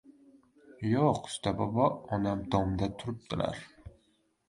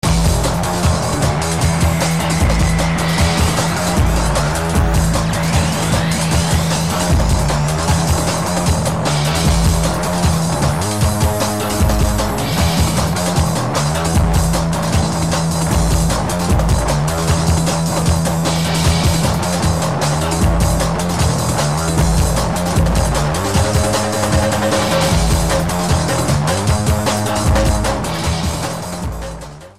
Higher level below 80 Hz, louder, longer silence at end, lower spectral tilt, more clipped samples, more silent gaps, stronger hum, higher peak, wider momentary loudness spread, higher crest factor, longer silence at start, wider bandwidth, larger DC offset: second, -52 dBFS vs -22 dBFS; second, -31 LUFS vs -16 LUFS; first, 0.6 s vs 0 s; first, -6.5 dB/octave vs -5 dB/octave; neither; neither; neither; second, -12 dBFS vs -2 dBFS; first, 10 LU vs 2 LU; first, 20 dB vs 14 dB; about the same, 0.1 s vs 0 s; second, 11.5 kHz vs 15.5 kHz; second, under 0.1% vs 2%